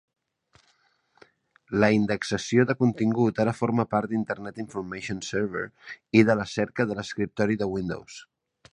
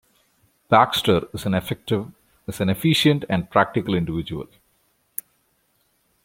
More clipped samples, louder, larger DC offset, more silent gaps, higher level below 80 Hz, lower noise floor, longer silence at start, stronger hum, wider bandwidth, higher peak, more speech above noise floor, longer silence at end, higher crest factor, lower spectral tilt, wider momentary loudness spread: neither; second, -26 LUFS vs -21 LUFS; neither; neither; second, -58 dBFS vs -52 dBFS; about the same, -67 dBFS vs -67 dBFS; first, 1.7 s vs 0.7 s; neither; second, 10.5 kHz vs 16.5 kHz; about the same, -4 dBFS vs -2 dBFS; second, 42 dB vs 46 dB; second, 0.5 s vs 1.8 s; about the same, 22 dB vs 22 dB; about the same, -6.5 dB/octave vs -5.5 dB/octave; second, 13 LU vs 17 LU